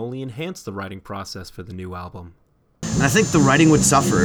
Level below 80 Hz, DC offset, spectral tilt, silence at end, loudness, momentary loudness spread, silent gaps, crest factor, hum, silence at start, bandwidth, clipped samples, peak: -42 dBFS; under 0.1%; -4.5 dB/octave; 0 s; -17 LUFS; 20 LU; none; 18 dB; none; 0 s; over 20 kHz; under 0.1%; -2 dBFS